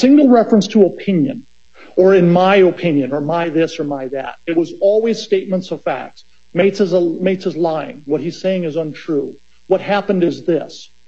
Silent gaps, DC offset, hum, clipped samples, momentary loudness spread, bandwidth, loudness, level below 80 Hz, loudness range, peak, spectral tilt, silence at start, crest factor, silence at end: none; 0.7%; none; under 0.1%; 12 LU; 7.6 kHz; -16 LUFS; -60 dBFS; 5 LU; 0 dBFS; -7 dB/octave; 0 s; 14 dB; 0.25 s